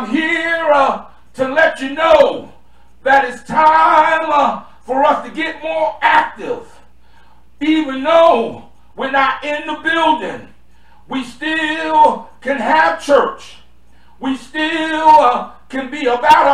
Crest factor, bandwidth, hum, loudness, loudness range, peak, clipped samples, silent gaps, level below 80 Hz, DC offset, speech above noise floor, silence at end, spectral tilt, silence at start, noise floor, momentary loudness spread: 14 dB; 12 kHz; none; -14 LUFS; 4 LU; 0 dBFS; under 0.1%; none; -50 dBFS; 1%; 36 dB; 0 s; -4 dB/octave; 0 s; -50 dBFS; 15 LU